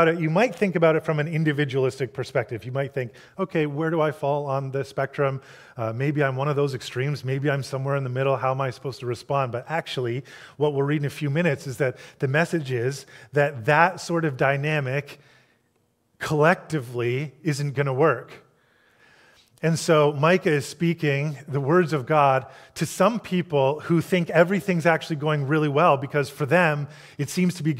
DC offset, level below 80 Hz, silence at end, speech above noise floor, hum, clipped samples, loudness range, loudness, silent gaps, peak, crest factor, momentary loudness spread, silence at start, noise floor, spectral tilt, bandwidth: under 0.1%; -66 dBFS; 0 s; 45 dB; none; under 0.1%; 5 LU; -24 LUFS; none; -2 dBFS; 22 dB; 10 LU; 0 s; -68 dBFS; -6.5 dB/octave; 15.5 kHz